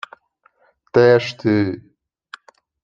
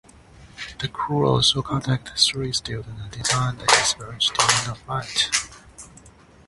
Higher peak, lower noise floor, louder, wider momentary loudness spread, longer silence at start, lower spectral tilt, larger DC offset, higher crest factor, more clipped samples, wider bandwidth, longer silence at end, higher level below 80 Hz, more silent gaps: about the same, -2 dBFS vs 0 dBFS; first, -60 dBFS vs -49 dBFS; first, -17 LUFS vs -21 LUFS; first, 19 LU vs 15 LU; first, 0.95 s vs 0.4 s; first, -7 dB/octave vs -2.5 dB/octave; neither; second, 18 dB vs 24 dB; neither; second, 7.4 kHz vs 11.5 kHz; first, 1.05 s vs 0.4 s; second, -60 dBFS vs -48 dBFS; neither